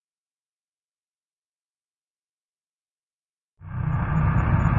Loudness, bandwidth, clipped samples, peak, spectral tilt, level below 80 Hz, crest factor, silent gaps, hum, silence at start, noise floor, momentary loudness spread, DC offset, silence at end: -24 LUFS; 7.2 kHz; under 0.1%; -8 dBFS; -10 dB/octave; -36 dBFS; 20 dB; none; none; 3.6 s; under -90 dBFS; 10 LU; under 0.1%; 0 s